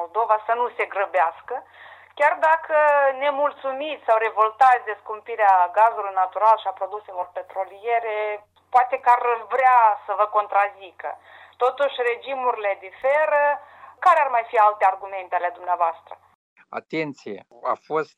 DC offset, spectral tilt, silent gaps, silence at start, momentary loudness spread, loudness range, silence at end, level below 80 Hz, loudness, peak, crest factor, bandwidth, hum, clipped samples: under 0.1%; -4 dB/octave; 16.35-16.56 s; 0 s; 14 LU; 4 LU; 0.1 s; -80 dBFS; -21 LUFS; -6 dBFS; 16 dB; 11 kHz; none; under 0.1%